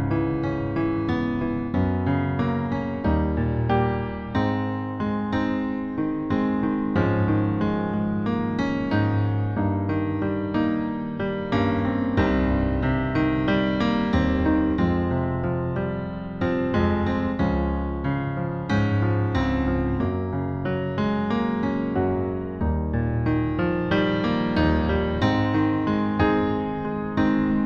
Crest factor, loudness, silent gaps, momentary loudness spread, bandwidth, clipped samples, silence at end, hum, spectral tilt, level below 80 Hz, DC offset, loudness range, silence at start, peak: 14 dB; -24 LUFS; none; 5 LU; 7 kHz; under 0.1%; 0 s; none; -9 dB/octave; -36 dBFS; under 0.1%; 3 LU; 0 s; -8 dBFS